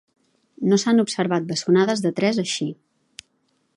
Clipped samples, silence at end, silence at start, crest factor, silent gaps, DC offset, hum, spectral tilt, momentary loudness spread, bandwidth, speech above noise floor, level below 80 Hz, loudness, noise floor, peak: under 0.1%; 1.05 s; 0.6 s; 16 dB; none; under 0.1%; none; -5 dB/octave; 8 LU; 11.5 kHz; 48 dB; -70 dBFS; -21 LUFS; -68 dBFS; -6 dBFS